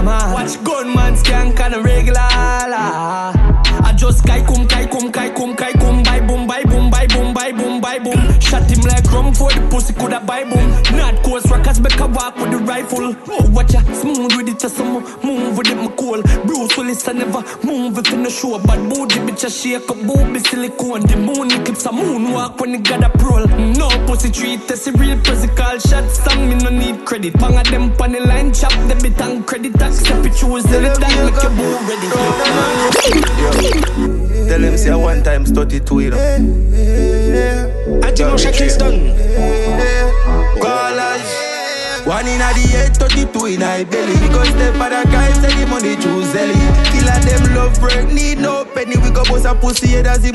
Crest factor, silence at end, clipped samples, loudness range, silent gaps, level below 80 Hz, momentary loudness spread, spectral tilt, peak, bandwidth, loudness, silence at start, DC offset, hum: 10 dB; 0 s; under 0.1%; 3 LU; none; -14 dBFS; 6 LU; -4.5 dB/octave; 0 dBFS; 12.5 kHz; -14 LUFS; 0 s; under 0.1%; none